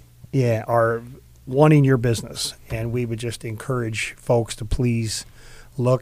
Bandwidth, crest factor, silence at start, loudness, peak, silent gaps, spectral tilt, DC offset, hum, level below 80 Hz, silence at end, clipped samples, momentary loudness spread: 16 kHz; 18 dB; 0.35 s; -22 LUFS; -4 dBFS; none; -6 dB/octave; under 0.1%; none; -40 dBFS; 0 s; under 0.1%; 13 LU